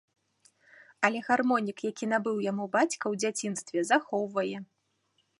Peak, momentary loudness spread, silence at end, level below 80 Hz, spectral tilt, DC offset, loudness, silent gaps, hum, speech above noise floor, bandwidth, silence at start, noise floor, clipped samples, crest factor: -8 dBFS; 8 LU; 0.75 s; -80 dBFS; -4 dB/octave; under 0.1%; -29 LUFS; none; none; 45 dB; 11.5 kHz; 1 s; -74 dBFS; under 0.1%; 24 dB